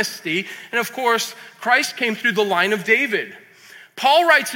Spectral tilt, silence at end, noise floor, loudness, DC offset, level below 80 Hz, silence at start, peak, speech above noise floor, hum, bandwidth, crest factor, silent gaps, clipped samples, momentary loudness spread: -2.5 dB/octave; 0 s; -45 dBFS; -19 LUFS; under 0.1%; -72 dBFS; 0 s; -2 dBFS; 26 dB; none; 17 kHz; 18 dB; none; under 0.1%; 10 LU